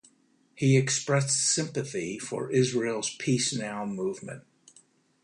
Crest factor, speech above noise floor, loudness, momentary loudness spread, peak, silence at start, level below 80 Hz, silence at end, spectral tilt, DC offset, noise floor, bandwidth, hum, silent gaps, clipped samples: 18 dB; 38 dB; -27 LUFS; 10 LU; -10 dBFS; 0.55 s; -68 dBFS; 0.85 s; -4 dB/octave; under 0.1%; -65 dBFS; 11 kHz; none; none; under 0.1%